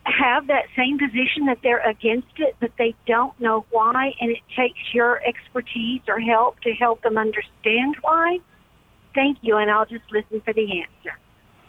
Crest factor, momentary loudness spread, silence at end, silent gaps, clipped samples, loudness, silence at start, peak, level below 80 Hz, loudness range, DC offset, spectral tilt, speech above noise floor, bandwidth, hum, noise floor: 16 dB; 8 LU; 0.55 s; none; under 0.1%; -21 LUFS; 0.05 s; -6 dBFS; -58 dBFS; 1 LU; under 0.1%; -6 dB/octave; 34 dB; 4.1 kHz; none; -55 dBFS